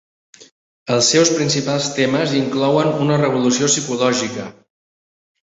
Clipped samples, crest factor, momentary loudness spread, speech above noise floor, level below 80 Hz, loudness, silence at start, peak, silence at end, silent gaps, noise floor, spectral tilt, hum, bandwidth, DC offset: under 0.1%; 16 dB; 8 LU; over 73 dB; -58 dBFS; -16 LUFS; 0.85 s; -2 dBFS; 1.05 s; none; under -90 dBFS; -4 dB/octave; none; 8 kHz; under 0.1%